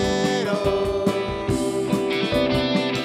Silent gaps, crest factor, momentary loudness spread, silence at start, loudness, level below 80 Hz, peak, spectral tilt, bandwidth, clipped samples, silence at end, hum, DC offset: none; 16 dB; 3 LU; 0 s; -22 LUFS; -42 dBFS; -6 dBFS; -5.5 dB/octave; 15 kHz; under 0.1%; 0 s; none; under 0.1%